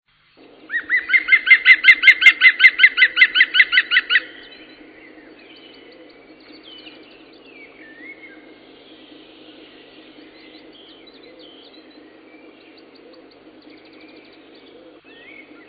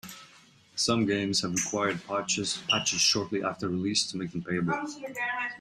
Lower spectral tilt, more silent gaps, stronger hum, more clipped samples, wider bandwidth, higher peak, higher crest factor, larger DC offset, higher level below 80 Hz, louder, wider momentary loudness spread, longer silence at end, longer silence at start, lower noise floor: second, 0 dB/octave vs -3 dB/octave; neither; neither; neither; second, 8 kHz vs 14 kHz; first, 0 dBFS vs -12 dBFS; about the same, 20 dB vs 18 dB; neither; about the same, -68 dBFS vs -66 dBFS; first, -11 LUFS vs -28 LUFS; about the same, 11 LU vs 9 LU; first, 7.55 s vs 0 s; first, 0.7 s vs 0.05 s; second, -51 dBFS vs -57 dBFS